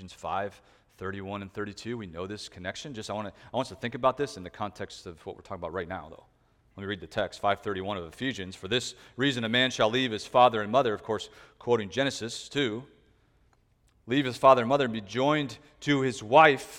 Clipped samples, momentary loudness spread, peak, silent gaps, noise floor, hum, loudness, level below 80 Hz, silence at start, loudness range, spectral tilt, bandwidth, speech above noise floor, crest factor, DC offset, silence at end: under 0.1%; 16 LU; -4 dBFS; none; -66 dBFS; none; -28 LUFS; -62 dBFS; 0 s; 10 LU; -4.5 dB/octave; 15.5 kHz; 38 dB; 24 dB; under 0.1%; 0 s